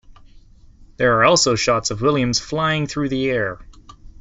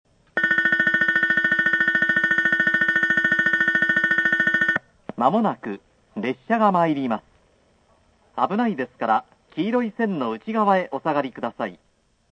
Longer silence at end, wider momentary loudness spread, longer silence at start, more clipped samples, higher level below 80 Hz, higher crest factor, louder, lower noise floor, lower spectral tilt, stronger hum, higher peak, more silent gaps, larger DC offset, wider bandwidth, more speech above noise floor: second, 0.1 s vs 0.55 s; second, 9 LU vs 12 LU; second, 0.1 s vs 0.35 s; neither; first, -44 dBFS vs -66 dBFS; about the same, 18 dB vs 18 dB; about the same, -18 LUFS vs -20 LUFS; second, -46 dBFS vs -60 dBFS; second, -4 dB/octave vs -6 dB/octave; neither; about the same, -2 dBFS vs -4 dBFS; neither; neither; second, 8 kHz vs 9.2 kHz; second, 28 dB vs 38 dB